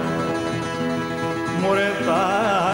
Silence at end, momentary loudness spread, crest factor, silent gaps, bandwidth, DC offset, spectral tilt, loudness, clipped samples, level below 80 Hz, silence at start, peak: 0 s; 5 LU; 14 dB; none; 16 kHz; under 0.1%; -5.5 dB/octave; -22 LUFS; under 0.1%; -54 dBFS; 0 s; -8 dBFS